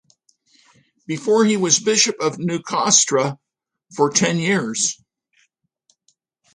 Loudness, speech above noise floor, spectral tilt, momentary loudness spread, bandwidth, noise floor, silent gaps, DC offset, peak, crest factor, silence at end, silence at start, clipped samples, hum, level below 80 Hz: -18 LUFS; 47 dB; -3 dB/octave; 13 LU; 11 kHz; -66 dBFS; none; under 0.1%; -2 dBFS; 20 dB; 1.6 s; 1.1 s; under 0.1%; none; -66 dBFS